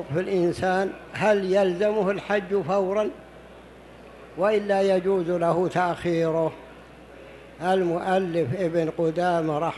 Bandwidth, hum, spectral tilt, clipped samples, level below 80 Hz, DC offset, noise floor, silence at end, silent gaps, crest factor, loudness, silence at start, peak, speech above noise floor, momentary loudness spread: 12 kHz; none; -7 dB/octave; under 0.1%; -56 dBFS; under 0.1%; -46 dBFS; 0 s; none; 16 dB; -24 LUFS; 0 s; -8 dBFS; 23 dB; 8 LU